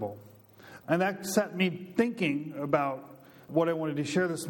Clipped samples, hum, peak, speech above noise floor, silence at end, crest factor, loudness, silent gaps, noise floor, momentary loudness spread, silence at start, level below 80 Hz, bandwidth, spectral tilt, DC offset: under 0.1%; none; -10 dBFS; 23 dB; 0 s; 20 dB; -30 LUFS; none; -52 dBFS; 9 LU; 0 s; -74 dBFS; 17.5 kHz; -5.5 dB/octave; under 0.1%